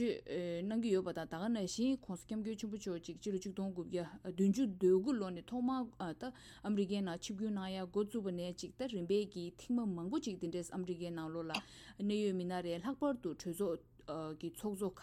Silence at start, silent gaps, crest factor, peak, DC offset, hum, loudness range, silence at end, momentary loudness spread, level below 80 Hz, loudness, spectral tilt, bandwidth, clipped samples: 0 s; none; 18 dB; -22 dBFS; under 0.1%; none; 3 LU; 0 s; 9 LU; -68 dBFS; -40 LUFS; -6 dB/octave; 15 kHz; under 0.1%